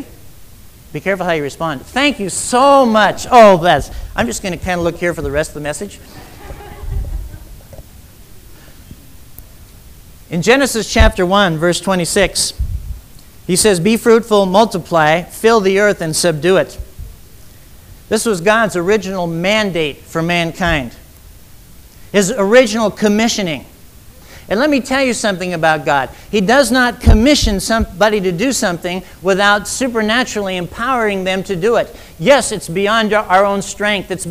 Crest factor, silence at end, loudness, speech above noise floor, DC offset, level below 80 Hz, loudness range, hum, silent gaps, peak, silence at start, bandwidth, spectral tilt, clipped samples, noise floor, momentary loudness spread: 14 dB; 0 s; -14 LUFS; 26 dB; under 0.1%; -28 dBFS; 9 LU; none; none; 0 dBFS; 0 s; 16 kHz; -4 dB/octave; under 0.1%; -39 dBFS; 13 LU